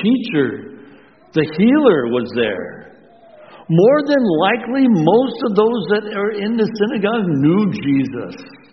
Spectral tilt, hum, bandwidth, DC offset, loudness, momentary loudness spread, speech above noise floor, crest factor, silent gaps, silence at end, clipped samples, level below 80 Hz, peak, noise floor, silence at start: -5.5 dB/octave; none; 6.2 kHz; 0.1%; -16 LUFS; 10 LU; 30 dB; 16 dB; none; 0.15 s; under 0.1%; -58 dBFS; 0 dBFS; -45 dBFS; 0 s